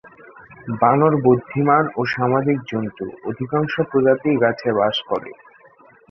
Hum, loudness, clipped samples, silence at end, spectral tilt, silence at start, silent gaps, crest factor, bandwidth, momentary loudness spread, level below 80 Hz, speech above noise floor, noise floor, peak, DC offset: none; -19 LUFS; under 0.1%; 0.8 s; -8 dB/octave; 0.05 s; none; 18 dB; 6.4 kHz; 13 LU; -58 dBFS; 31 dB; -50 dBFS; -2 dBFS; under 0.1%